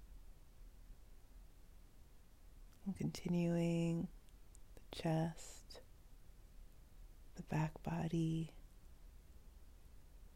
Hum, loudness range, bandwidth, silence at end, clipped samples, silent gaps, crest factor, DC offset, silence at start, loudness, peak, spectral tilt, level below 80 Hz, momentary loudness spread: none; 6 LU; 15.5 kHz; 0 s; under 0.1%; none; 18 dB; under 0.1%; 0 s; -42 LUFS; -26 dBFS; -7 dB/octave; -60 dBFS; 27 LU